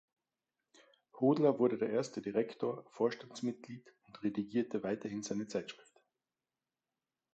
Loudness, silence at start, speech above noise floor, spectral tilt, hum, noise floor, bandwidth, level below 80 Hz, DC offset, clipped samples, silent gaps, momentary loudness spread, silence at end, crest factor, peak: -36 LUFS; 1.15 s; over 55 dB; -6 dB/octave; none; under -90 dBFS; 8.6 kHz; -80 dBFS; under 0.1%; under 0.1%; none; 14 LU; 1.6 s; 20 dB; -18 dBFS